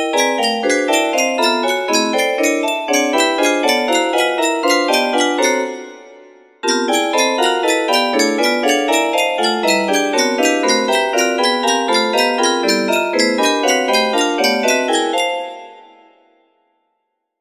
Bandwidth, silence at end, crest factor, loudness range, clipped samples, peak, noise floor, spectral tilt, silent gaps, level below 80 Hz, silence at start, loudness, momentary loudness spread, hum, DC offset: 15.5 kHz; 1.6 s; 16 dB; 2 LU; under 0.1%; 0 dBFS; -72 dBFS; -1.5 dB/octave; none; -66 dBFS; 0 s; -15 LUFS; 3 LU; none; under 0.1%